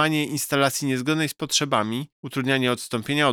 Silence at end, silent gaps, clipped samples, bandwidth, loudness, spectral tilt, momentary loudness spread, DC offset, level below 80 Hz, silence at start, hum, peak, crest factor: 0 s; 2.12-2.23 s; under 0.1%; over 20 kHz; -23 LUFS; -4 dB/octave; 7 LU; under 0.1%; -66 dBFS; 0 s; none; -6 dBFS; 16 dB